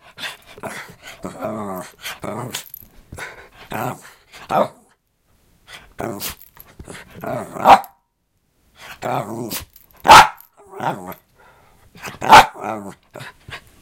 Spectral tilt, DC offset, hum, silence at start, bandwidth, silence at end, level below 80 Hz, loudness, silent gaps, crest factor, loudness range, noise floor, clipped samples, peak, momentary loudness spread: -3 dB/octave; under 0.1%; none; 0.2 s; 17 kHz; 0.25 s; -46 dBFS; -16 LUFS; none; 20 dB; 16 LU; -67 dBFS; under 0.1%; 0 dBFS; 28 LU